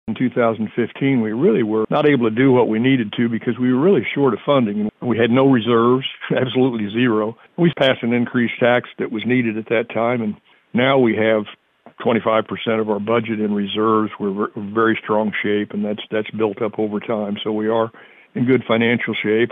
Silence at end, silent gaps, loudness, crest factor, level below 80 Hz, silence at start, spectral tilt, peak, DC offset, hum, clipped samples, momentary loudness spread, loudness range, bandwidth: 0 s; none; -18 LUFS; 14 dB; -64 dBFS; 0.05 s; -9 dB/octave; -4 dBFS; under 0.1%; none; under 0.1%; 8 LU; 4 LU; 4 kHz